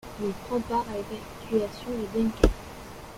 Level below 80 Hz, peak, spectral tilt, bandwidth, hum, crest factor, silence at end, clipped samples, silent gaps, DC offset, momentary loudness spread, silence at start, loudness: -36 dBFS; -2 dBFS; -6 dB/octave; 16.5 kHz; none; 26 dB; 0 s; under 0.1%; none; under 0.1%; 14 LU; 0.05 s; -29 LUFS